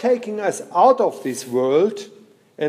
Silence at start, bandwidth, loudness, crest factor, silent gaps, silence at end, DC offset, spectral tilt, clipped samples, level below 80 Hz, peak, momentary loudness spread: 0 s; 15.5 kHz; -19 LUFS; 18 dB; none; 0 s; under 0.1%; -5 dB/octave; under 0.1%; -78 dBFS; -2 dBFS; 9 LU